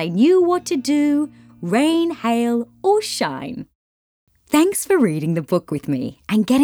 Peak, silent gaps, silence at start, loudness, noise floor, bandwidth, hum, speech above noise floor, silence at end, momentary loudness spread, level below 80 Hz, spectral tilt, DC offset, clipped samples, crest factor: -4 dBFS; 3.75-4.27 s; 0 s; -19 LUFS; under -90 dBFS; over 20 kHz; none; over 72 dB; 0 s; 9 LU; -60 dBFS; -5.5 dB/octave; under 0.1%; under 0.1%; 14 dB